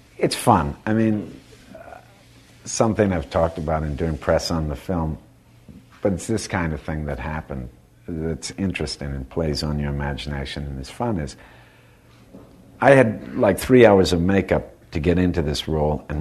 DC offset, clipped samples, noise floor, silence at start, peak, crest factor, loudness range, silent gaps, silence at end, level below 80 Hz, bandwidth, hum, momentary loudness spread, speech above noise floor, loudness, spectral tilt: under 0.1%; under 0.1%; -51 dBFS; 0.2 s; 0 dBFS; 22 dB; 10 LU; none; 0 s; -36 dBFS; 13.5 kHz; none; 15 LU; 30 dB; -21 LUFS; -6 dB/octave